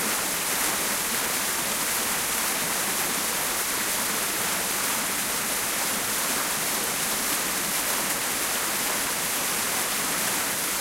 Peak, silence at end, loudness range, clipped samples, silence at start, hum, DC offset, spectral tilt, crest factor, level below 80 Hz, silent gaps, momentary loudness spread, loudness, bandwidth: -8 dBFS; 0 s; 0 LU; under 0.1%; 0 s; none; under 0.1%; -0.5 dB/octave; 18 dB; -56 dBFS; none; 1 LU; -24 LUFS; 16 kHz